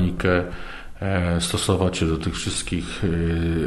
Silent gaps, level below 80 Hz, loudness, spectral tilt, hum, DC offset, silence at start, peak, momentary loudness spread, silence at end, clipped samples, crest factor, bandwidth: none; -34 dBFS; -23 LUFS; -5 dB/octave; none; under 0.1%; 0 s; -6 dBFS; 9 LU; 0 s; under 0.1%; 16 dB; 12.5 kHz